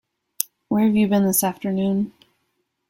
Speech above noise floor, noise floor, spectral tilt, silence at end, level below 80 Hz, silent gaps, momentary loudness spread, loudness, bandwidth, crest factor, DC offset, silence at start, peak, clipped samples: 53 dB; -73 dBFS; -5.5 dB/octave; 0.8 s; -60 dBFS; none; 10 LU; -21 LUFS; 16.5 kHz; 22 dB; under 0.1%; 0.4 s; 0 dBFS; under 0.1%